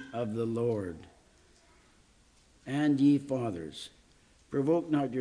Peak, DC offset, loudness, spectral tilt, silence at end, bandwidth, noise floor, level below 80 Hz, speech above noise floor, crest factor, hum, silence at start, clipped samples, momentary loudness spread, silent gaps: -16 dBFS; under 0.1%; -30 LUFS; -7.5 dB/octave; 0 s; 10.5 kHz; -63 dBFS; -66 dBFS; 34 dB; 16 dB; none; 0 s; under 0.1%; 19 LU; none